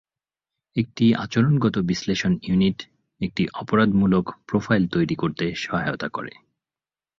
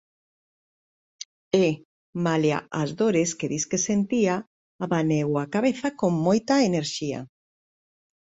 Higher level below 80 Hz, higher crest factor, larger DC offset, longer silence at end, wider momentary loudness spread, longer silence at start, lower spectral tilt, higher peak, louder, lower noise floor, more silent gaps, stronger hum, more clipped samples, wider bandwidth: first, -50 dBFS vs -64 dBFS; about the same, 18 dB vs 20 dB; neither; about the same, 0.9 s vs 1 s; second, 10 LU vs 13 LU; second, 0.75 s vs 1.55 s; first, -6.5 dB/octave vs -5 dB/octave; about the same, -6 dBFS vs -6 dBFS; about the same, -22 LUFS vs -24 LUFS; about the same, under -90 dBFS vs under -90 dBFS; second, none vs 1.85-2.13 s, 4.47-4.79 s; neither; neither; second, 7.4 kHz vs 8.2 kHz